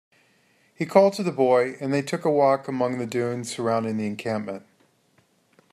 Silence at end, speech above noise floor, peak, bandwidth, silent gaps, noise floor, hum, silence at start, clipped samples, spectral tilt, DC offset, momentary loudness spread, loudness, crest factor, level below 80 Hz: 1.15 s; 41 dB; -4 dBFS; 14 kHz; none; -64 dBFS; none; 0.8 s; under 0.1%; -6 dB/octave; under 0.1%; 10 LU; -23 LUFS; 22 dB; -72 dBFS